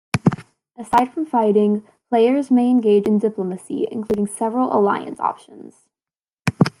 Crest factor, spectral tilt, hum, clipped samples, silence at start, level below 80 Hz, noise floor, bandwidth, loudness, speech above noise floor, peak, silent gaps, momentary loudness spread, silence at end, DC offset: 18 dB; -7 dB/octave; none; under 0.1%; 0.15 s; -56 dBFS; under -90 dBFS; 12.5 kHz; -19 LUFS; over 72 dB; 0 dBFS; 6.33-6.37 s; 10 LU; 0.1 s; under 0.1%